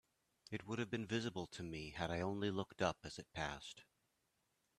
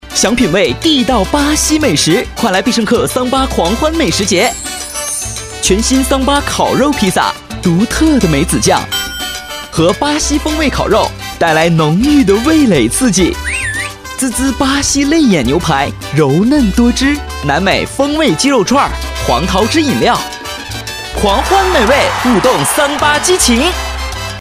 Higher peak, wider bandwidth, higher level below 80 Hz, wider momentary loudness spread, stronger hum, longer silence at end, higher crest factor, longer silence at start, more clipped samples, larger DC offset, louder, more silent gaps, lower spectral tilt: second, -22 dBFS vs 0 dBFS; second, 13.5 kHz vs 16 kHz; second, -68 dBFS vs -26 dBFS; about the same, 10 LU vs 8 LU; neither; first, 0.95 s vs 0 s; first, 24 dB vs 12 dB; first, 0.5 s vs 0.05 s; neither; neither; second, -44 LUFS vs -11 LUFS; neither; about the same, -5 dB/octave vs -4 dB/octave